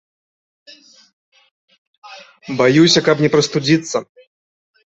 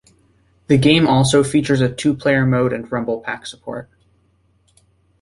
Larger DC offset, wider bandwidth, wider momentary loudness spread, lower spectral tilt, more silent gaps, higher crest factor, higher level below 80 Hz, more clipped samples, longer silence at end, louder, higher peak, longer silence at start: neither; second, 8.2 kHz vs 11.5 kHz; about the same, 14 LU vs 16 LU; about the same, -4.5 dB/octave vs -5.5 dB/octave; neither; about the same, 18 dB vs 16 dB; second, -56 dBFS vs -48 dBFS; neither; second, 0.85 s vs 1.4 s; about the same, -14 LUFS vs -16 LUFS; about the same, -2 dBFS vs -2 dBFS; first, 2.05 s vs 0.7 s